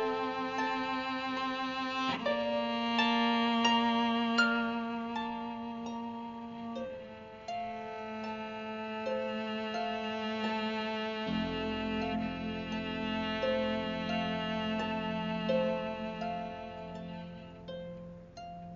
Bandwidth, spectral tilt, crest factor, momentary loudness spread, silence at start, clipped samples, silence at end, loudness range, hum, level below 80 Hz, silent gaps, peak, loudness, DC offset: 7.2 kHz; -3 dB/octave; 20 dB; 15 LU; 0 s; under 0.1%; 0 s; 10 LU; none; -60 dBFS; none; -14 dBFS; -34 LUFS; under 0.1%